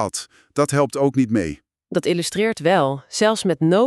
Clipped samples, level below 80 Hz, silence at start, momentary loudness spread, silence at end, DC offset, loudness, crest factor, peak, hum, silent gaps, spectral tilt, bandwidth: under 0.1%; -52 dBFS; 0 s; 10 LU; 0 s; under 0.1%; -20 LUFS; 16 dB; -4 dBFS; none; none; -5 dB/octave; 13.5 kHz